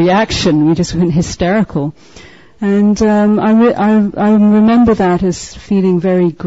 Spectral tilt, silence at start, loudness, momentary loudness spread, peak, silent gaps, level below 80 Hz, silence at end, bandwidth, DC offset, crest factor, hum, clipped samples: -6.5 dB/octave; 0 s; -11 LUFS; 8 LU; -2 dBFS; none; -36 dBFS; 0 s; 8 kHz; 0.6%; 10 dB; none; under 0.1%